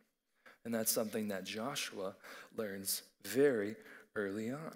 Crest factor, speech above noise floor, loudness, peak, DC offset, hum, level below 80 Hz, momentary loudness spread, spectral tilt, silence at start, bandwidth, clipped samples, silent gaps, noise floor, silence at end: 20 dB; 29 dB; -38 LUFS; -20 dBFS; under 0.1%; none; -86 dBFS; 13 LU; -3.5 dB/octave; 0.45 s; 16 kHz; under 0.1%; none; -67 dBFS; 0 s